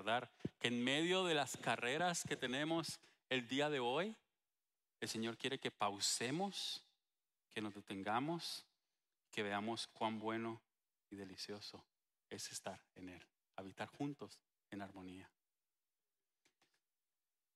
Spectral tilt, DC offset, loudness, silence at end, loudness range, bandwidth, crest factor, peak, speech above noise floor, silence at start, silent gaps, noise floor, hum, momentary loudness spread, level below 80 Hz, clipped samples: -3.5 dB/octave; under 0.1%; -42 LUFS; 2.3 s; 14 LU; 15.5 kHz; 26 dB; -18 dBFS; over 47 dB; 0 s; none; under -90 dBFS; none; 18 LU; -86 dBFS; under 0.1%